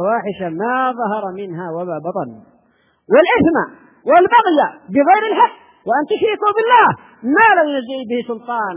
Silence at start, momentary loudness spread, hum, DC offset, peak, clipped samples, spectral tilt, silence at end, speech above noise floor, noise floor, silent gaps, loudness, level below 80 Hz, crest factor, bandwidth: 0 s; 14 LU; none; under 0.1%; 0 dBFS; under 0.1%; -9 dB/octave; 0 s; 43 dB; -58 dBFS; none; -15 LUFS; -56 dBFS; 16 dB; 4 kHz